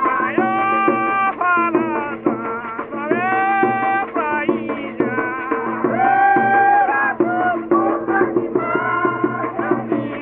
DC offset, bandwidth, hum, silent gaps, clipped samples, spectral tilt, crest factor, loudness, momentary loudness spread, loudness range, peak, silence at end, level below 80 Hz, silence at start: under 0.1%; 3.8 kHz; none; none; under 0.1%; -4.5 dB/octave; 16 dB; -18 LUFS; 8 LU; 3 LU; -2 dBFS; 0 s; -58 dBFS; 0 s